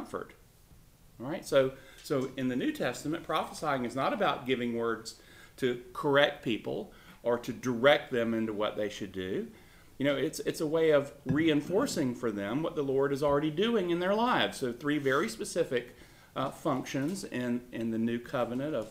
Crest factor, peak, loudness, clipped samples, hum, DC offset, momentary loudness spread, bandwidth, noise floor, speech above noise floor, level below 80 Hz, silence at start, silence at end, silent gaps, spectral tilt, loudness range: 22 dB; -10 dBFS; -31 LUFS; under 0.1%; none; under 0.1%; 11 LU; 16 kHz; -58 dBFS; 27 dB; -62 dBFS; 0 s; 0 s; none; -5 dB/octave; 4 LU